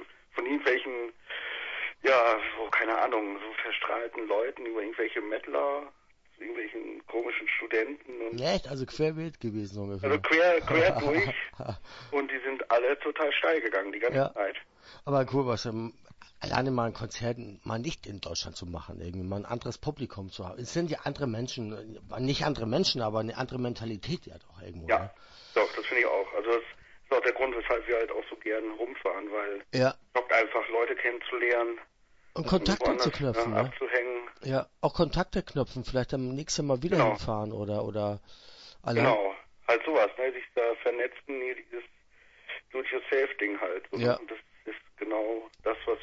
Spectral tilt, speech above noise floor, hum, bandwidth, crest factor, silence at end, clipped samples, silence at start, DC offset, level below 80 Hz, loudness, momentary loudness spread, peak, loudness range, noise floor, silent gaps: -5 dB/octave; 29 dB; none; 8 kHz; 20 dB; 0 s; under 0.1%; 0 s; under 0.1%; -52 dBFS; -30 LUFS; 14 LU; -10 dBFS; 6 LU; -59 dBFS; none